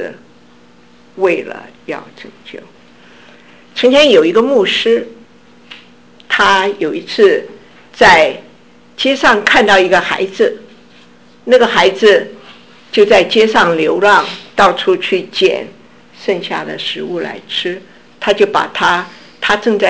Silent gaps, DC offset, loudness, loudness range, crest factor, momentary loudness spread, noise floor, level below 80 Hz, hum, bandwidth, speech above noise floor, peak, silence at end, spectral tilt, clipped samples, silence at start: none; under 0.1%; -11 LUFS; 7 LU; 14 dB; 18 LU; -45 dBFS; -50 dBFS; none; 8 kHz; 33 dB; 0 dBFS; 0 s; -3.5 dB/octave; under 0.1%; 0 s